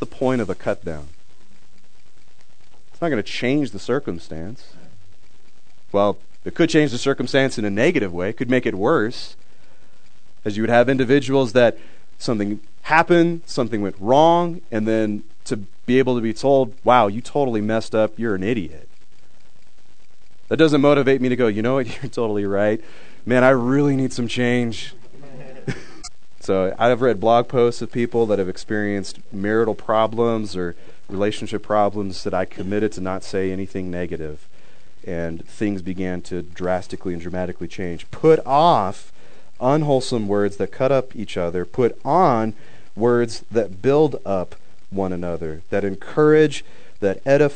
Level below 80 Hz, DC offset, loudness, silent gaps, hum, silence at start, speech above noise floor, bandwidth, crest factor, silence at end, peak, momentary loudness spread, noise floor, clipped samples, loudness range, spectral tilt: -52 dBFS; 4%; -20 LUFS; none; none; 0 s; 38 dB; 9.4 kHz; 20 dB; 0 s; 0 dBFS; 15 LU; -58 dBFS; under 0.1%; 7 LU; -6.5 dB/octave